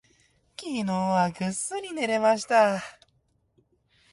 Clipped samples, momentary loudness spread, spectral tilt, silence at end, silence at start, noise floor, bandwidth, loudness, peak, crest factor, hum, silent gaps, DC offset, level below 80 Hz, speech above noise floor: under 0.1%; 15 LU; -4.5 dB/octave; 1.2 s; 0.6 s; -69 dBFS; 11.5 kHz; -25 LUFS; -8 dBFS; 18 dB; none; none; under 0.1%; -68 dBFS; 44 dB